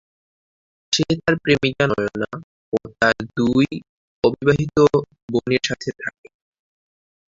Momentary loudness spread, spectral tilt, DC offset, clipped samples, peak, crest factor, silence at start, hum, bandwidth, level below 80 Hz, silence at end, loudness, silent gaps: 11 LU; -5 dB/octave; under 0.1%; under 0.1%; 0 dBFS; 20 dB; 0.9 s; none; 7.8 kHz; -50 dBFS; 1.3 s; -20 LUFS; 2.44-2.72 s, 3.89-4.22 s, 5.22-5.28 s